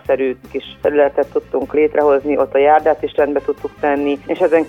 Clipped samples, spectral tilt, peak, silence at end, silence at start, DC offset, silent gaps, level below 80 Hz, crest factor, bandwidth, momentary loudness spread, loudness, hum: under 0.1%; -7 dB/octave; -2 dBFS; 0 s; 0.05 s; under 0.1%; none; -48 dBFS; 14 dB; 6.4 kHz; 8 LU; -16 LUFS; none